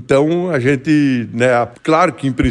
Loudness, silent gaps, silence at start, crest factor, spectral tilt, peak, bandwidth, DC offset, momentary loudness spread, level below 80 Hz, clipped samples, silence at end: -15 LUFS; none; 0 s; 14 dB; -7 dB/octave; -2 dBFS; 10.5 kHz; under 0.1%; 3 LU; -44 dBFS; under 0.1%; 0 s